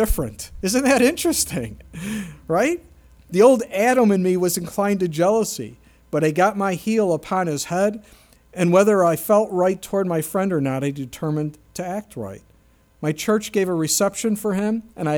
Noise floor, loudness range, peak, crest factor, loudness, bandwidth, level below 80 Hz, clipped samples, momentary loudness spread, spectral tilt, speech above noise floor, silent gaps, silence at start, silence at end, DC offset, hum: -56 dBFS; 6 LU; -2 dBFS; 18 dB; -20 LUFS; over 20 kHz; -42 dBFS; under 0.1%; 14 LU; -5 dB/octave; 36 dB; none; 0 s; 0 s; under 0.1%; none